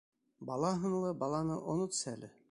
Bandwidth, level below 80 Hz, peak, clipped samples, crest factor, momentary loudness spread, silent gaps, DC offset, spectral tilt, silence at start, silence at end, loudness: 11.5 kHz; -68 dBFS; -20 dBFS; under 0.1%; 18 dB; 9 LU; none; under 0.1%; -5.5 dB/octave; 0.4 s; 0.2 s; -36 LUFS